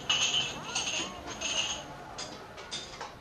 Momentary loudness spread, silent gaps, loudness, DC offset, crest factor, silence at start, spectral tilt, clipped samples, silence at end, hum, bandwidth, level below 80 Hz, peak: 15 LU; none; -32 LUFS; under 0.1%; 18 dB; 0 s; -0.5 dB/octave; under 0.1%; 0 s; none; 15.5 kHz; -58 dBFS; -16 dBFS